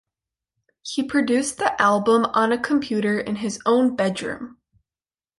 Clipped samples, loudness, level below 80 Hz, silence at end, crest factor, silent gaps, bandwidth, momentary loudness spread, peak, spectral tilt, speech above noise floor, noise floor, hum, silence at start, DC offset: under 0.1%; -21 LUFS; -62 dBFS; 0.9 s; 20 dB; none; 11.5 kHz; 11 LU; -4 dBFS; -4.5 dB/octave; over 69 dB; under -90 dBFS; none; 0.85 s; under 0.1%